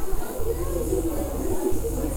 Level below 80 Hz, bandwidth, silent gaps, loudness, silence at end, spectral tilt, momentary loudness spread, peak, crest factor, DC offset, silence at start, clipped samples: -30 dBFS; 20 kHz; none; -28 LUFS; 0 s; -6 dB/octave; 4 LU; -12 dBFS; 12 dB; under 0.1%; 0 s; under 0.1%